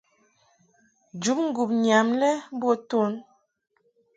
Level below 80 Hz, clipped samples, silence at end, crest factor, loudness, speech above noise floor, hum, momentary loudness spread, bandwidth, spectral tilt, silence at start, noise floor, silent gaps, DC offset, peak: -74 dBFS; under 0.1%; 0.95 s; 20 dB; -24 LUFS; 41 dB; none; 9 LU; 9.4 kHz; -4.5 dB/octave; 1.15 s; -65 dBFS; none; under 0.1%; -6 dBFS